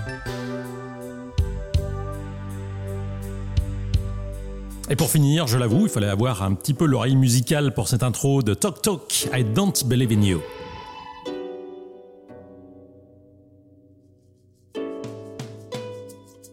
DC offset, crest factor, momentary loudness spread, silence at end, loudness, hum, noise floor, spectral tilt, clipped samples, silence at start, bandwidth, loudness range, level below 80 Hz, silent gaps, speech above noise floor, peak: under 0.1%; 16 dB; 18 LU; 0.05 s; -23 LUFS; none; -57 dBFS; -5.5 dB/octave; under 0.1%; 0 s; 16.5 kHz; 18 LU; -36 dBFS; none; 36 dB; -8 dBFS